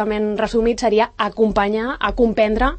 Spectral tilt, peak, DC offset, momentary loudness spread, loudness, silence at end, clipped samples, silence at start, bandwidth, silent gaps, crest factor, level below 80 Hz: -5.5 dB/octave; -4 dBFS; under 0.1%; 4 LU; -18 LUFS; 0 s; under 0.1%; 0 s; 8.8 kHz; none; 14 dB; -32 dBFS